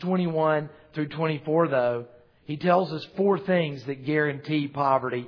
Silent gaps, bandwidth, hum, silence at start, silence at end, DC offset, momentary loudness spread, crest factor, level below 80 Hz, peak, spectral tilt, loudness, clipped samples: none; 5.4 kHz; none; 0 s; 0 s; under 0.1%; 10 LU; 18 dB; -70 dBFS; -8 dBFS; -9 dB/octave; -26 LUFS; under 0.1%